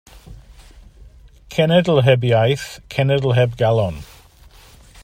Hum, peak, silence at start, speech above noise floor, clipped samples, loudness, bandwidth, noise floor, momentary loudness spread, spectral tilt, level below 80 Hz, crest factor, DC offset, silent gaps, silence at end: none; -2 dBFS; 0.15 s; 30 dB; under 0.1%; -17 LUFS; 15.5 kHz; -46 dBFS; 11 LU; -6.5 dB/octave; -44 dBFS; 18 dB; under 0.1%; none; 1 s